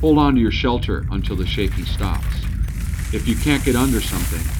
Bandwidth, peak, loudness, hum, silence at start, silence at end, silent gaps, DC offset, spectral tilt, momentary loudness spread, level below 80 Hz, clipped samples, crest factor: over 20 kHz; -4 dBFS; -20 LUFS; none; 0 s; 0 s; none; under 0.1%; -5.5 dB/octave; 8 LU; -24 dBFS; under 0.1%; 16 dB